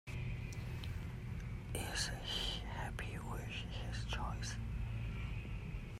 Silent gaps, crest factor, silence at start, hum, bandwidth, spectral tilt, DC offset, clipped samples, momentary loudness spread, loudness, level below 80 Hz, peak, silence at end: none; 16 dB; 0.05 s; none; 16 kHz; -4 dB/octave; under 0.1%; under 0.1%; 7 LU; -43 LUFS; -48 dBFS; -26 dBFS; 0 s